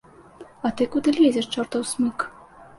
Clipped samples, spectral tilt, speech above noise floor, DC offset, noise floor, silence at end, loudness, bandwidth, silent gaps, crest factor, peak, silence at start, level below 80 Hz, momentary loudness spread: under 0.1%; -4 dB/octave; 24 dB; under 0.1%; -46 dBFS; 0.15 s; -23 LUFS; 11.5 kHz; none; 16 dB; -8 dBFS; 0.4 s; -58 dBFS; 11 LU